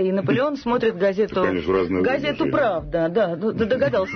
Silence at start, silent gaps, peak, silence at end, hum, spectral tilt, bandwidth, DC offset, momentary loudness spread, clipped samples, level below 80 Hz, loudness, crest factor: 0 s; none; -10 dBFS; 0 s; none; -7.5 dB/octave; 6.4 kHz; under 0.1%; 2 LU; under 0.1%; -46 dBFS; -21 LUFS; 12 dB